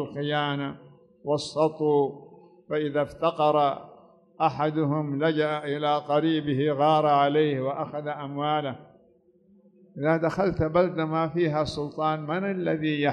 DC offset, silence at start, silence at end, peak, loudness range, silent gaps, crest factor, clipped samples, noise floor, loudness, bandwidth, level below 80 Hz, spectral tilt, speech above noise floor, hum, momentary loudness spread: under 0.1%; 0 s; 0 s; -10 dBFS; 4 LU; none; 16 dB; under 0.1%; -61 dBFS; -26 LUFS; 10 kHz; -56 dBFS; -7 dB/octave; 36 dB; none; 10 LU